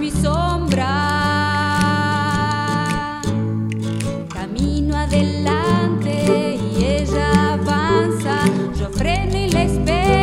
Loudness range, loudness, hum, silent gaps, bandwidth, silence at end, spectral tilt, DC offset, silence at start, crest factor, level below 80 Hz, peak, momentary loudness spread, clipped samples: 3 LU; -19 LUFS; none; none; 15.5 kHz; 0 s; -6 dB/octave; 0.1%; 0 s; 16 dB; -28 dBFS; -2 dBFS; 6 LU; under 0.1%